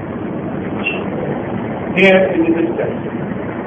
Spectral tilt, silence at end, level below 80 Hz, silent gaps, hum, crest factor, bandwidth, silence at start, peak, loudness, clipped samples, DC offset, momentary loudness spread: -8 dB/octave; 0 s; -46 dBFS; none; none; 16 dB; 8.2 kHz; 0 s; 0 dBFS; -17 LUFS; under 0.1%; under 0.1%; 12 LU